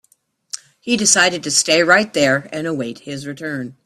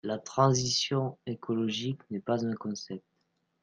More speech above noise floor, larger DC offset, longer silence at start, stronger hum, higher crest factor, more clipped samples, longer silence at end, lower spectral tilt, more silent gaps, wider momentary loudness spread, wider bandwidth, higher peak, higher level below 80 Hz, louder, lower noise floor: about the same, 43 dB vs 46 dB; neither; first, 0.55 s vs 0.05 s; neither; about the same, 18 dB vs 20 dB; neither; second, 0.15 s vs 0.65 s; second, -2 dB/octave vs -5 dB/octave; neither; first, 17 LU vs 14 LU; first, 15 kHz vs 10 kHz; first, 0 dBFS vs -10 dBFS; first, -60 dBFS vs -66 dBFS; first, -16 LUFS vs -30 LUFS; second, -60 dBFS vs -77 dBFS